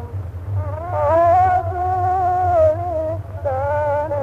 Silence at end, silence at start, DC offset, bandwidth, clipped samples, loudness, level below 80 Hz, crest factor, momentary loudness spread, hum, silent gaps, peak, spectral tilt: 0 s; 0 s; under 0.1%; 7.6 kHz; under 0.1%; -18 LUFS; -38 dBFS; 12 dB; 11 LU; none; none; -6 dBFS; -9 dB/octave